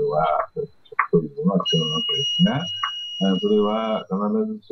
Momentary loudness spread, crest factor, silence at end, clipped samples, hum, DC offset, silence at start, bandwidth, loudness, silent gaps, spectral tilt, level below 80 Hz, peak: 6 LU; 18 dB; 0.15 s; under 0.1%; none; under 0.1%; 0 s; 6.2 kHz; -22 LUFS; none; -5.5 dB/octave; -56 dBFS; -4 dBFS